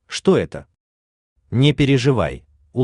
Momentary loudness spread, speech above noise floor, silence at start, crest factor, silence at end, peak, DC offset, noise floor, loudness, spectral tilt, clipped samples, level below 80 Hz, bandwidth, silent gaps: 16 LU; over 73 dB; 0.1 s; 16 dB; 0 s; -4 dBFS; under 0.1%; under -90 dBFS; -18 LUFS; -6.5 dB/octave; under 0.1%; -44 dBFS; 10.5 kHz; 0.80-1.36 s